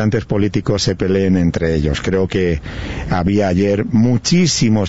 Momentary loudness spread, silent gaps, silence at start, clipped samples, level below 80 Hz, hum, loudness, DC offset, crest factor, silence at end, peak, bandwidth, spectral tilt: 6 LU; none; 0 s; under 0.1%; -32 dBFS; none; -16 LUFS; 1%; 12 dB; 0 s; -4 dBFS; 8 kHz; -5.5 dB/octave